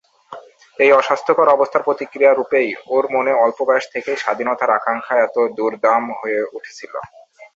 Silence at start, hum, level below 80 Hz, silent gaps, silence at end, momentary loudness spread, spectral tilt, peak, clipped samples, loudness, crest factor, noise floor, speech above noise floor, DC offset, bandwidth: 0.3 s; none; -66 dBFS; none; 0.1 s; 10 LU; -4.5 dB/octave; -2 dBFS; under 0.1%; -17 LUFS; 16 dB; -39 dBFS; 22 dB; under 0.1%; 7.8 kHz